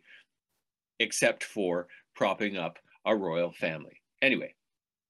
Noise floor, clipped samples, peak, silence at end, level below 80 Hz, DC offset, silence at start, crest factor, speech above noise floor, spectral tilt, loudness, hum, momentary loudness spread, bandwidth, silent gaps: -90 dBFS; under 0.1%; -10 dBFS; 0.6 s; -80 dBFS; under 0.1%; 1 s; 22 dB; 60 dB; -3.5 dB/octave; -30 LUFS; none; 11 LU; 12.5 kHz; none